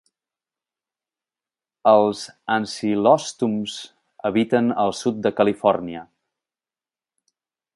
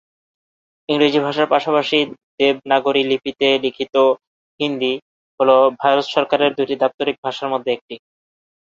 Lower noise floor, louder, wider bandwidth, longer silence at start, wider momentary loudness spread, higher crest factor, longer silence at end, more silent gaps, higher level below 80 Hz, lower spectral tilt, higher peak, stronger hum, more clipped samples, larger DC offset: about the same, under -90 dBFS vs under -90 dBFS; second, -21 LUFS vs -18 LUFS; first, 11.5 kHz vs 7.6 kHz; first, 1.85 s vs 0.9 s; first, 13 LU vs 9 LU; about the same, 22 dB vs 18 dB; first, 1.75 s vs 0.65 s; second, none vs 2.23-2.38 s, 4.27-4.58 s, 5.02-5.38 s, 6.94-6.98 s, 7.18-7.23 s, 7.81-7.89 s; about the same, -64 dBFS vs -64 dBFS; about the same, -5 dB/octave vs -5 dB/octave; about the same, -2 dBFS vs 0 dBFS; neither; neither; neither